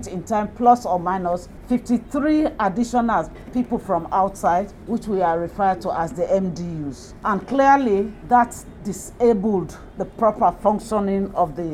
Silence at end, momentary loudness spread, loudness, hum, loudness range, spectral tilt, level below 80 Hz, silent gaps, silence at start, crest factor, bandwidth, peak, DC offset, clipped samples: 0 s; 11 LU; -21 LUFS; none; 2 LU; -6.5 dB/octave; -44 dBFS; none; 0 s; 18 dB; 15 kHz; -2 dBFS; under 0.1%; under 0.1%